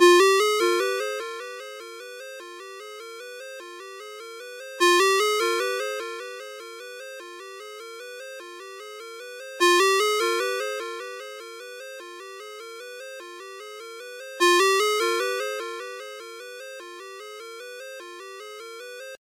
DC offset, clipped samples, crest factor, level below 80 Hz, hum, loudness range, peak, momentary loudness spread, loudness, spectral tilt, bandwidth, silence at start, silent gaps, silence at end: under 0.1%; under 0.1%; 22 dB; under -90 dBFS; none; 14 LU; -4 dBFS; 20 LU; -22 LUFS; 1 dB/octave; 16 kHz; 0 s; none; 0.05 s